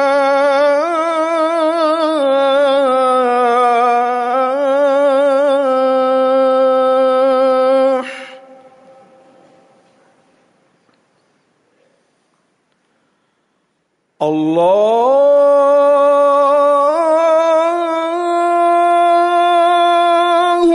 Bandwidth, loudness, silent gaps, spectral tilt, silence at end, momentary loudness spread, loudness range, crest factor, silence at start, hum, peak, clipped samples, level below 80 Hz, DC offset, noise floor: 11 kHz; -12 LUFS; none; -4.5 dB/octave; 0 s; 5 LU; 7 LU; 10 dB; 0 s; none; -4 dBFS; under 0.1%; -64 dBFS; under 0.1%; -65 dBFS